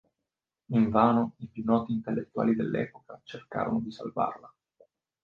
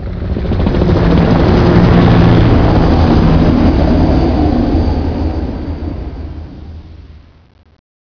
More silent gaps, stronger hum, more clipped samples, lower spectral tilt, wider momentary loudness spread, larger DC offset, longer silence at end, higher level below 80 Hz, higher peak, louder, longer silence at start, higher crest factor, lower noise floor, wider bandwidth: neither; neither; neither; about the same, -9 dB/octave vs -9 dB/octave; about the same, 15 LU vs 17 LU; neither; second, 0.75 s vs 0.9 s; second, -62 dBFS vs -18 dBFS; second, -6 dBFS vs 0 dBFS; second, -29 LUFS vs -11 LUFS; first, 0.7 s vs 0 s; first, 22 dB vs 10 dB; first, -88 dBFS vs -37 dBFS; about the same, 5.4 kHz vs 5.4 kHz